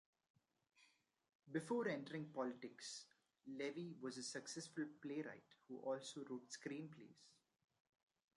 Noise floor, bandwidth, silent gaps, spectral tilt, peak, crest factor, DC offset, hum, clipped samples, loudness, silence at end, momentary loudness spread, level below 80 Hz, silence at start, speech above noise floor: -78 dBFS; 11.5 kHz; 1.35-1.39 s; -4.5 dB/octave; -32 dBFS; 20 dB; under 0.1%; none; under 0.1%; -50 LUFS; 1.05 s; 14 LU; under -90 dBFS; 0.8 s; 29 dB